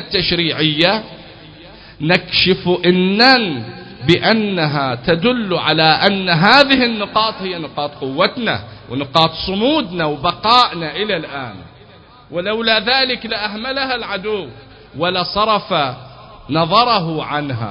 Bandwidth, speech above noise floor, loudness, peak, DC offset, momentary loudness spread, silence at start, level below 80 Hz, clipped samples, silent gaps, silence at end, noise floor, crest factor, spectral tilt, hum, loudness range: 8 kHz; 27 dB; -15 LUFS; 0 dBFS; under 0.1%; 13 LU; 0 s; -46 dBFS; under 0.1%; none; 0 s; -43 dBFS; 16 dB; -6 dB/octave; none; 5 LU